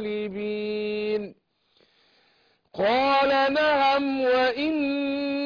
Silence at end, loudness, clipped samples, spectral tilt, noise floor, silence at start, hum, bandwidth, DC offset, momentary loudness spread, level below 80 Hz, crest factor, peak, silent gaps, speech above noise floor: 0 s; -24 LUFS; under 0.1%; -5.5 dB/octave; -65 dBFS; 0 s; none; 5.2 kHz; under 0.1%; 10 LU; -62 dBFS; 12 dB; -14 dBFS; none; 41 dB